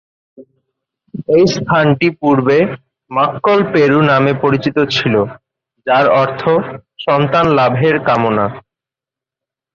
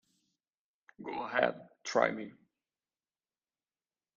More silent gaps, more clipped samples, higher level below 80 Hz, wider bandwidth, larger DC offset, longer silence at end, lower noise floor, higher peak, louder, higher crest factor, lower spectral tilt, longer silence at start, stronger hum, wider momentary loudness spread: neither; neither; first, -50 dBFS vs -78 dBFS; about the same, 7.2 kHz vs 7.4 kHz; neither; second, 1.15 s vs 1.85 s; about the same, -87 dBFS vs under -90 dBFS; first, -2 dBFS vs -12 dBFS; first, -13 LUFS vs -34 LUFS; second, 12 dB vs 26 dB; first, -6.5 dB/octave vs -4 dB/octave; second, 0.4 s vs 1 s; neither; second, 10 LU vs 16 LU